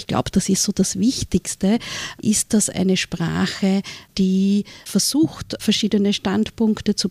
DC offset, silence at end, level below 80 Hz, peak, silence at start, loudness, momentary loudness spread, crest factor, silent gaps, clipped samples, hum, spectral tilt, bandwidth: under 0.1%; 0 s; -44 dBFS; -6 dBFS; 0 s; -20 LUFS; 5 LU; 14 dB; none; under 0.1%; none; -4.5 dB/octave; 15.5 kHz